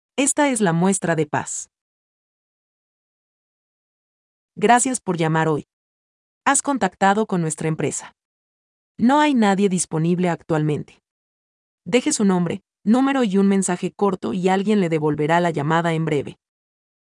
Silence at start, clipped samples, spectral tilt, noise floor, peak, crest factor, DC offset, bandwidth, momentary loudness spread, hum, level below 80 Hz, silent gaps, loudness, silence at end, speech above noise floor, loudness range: 0.15 s; under 0.1%; -5 dB/octave; under -90 dBFS; -2 dBFS; 18 dB; under 0.1%; 12 kHz; 8 LU; none; -64 dBFS; 1.81-4.49 s, 5.73-6.41 s, 8.25-8.95 s, 11.11-11.78 s; -20 LUFS; 0.85 s; over 71 dB; 5 LU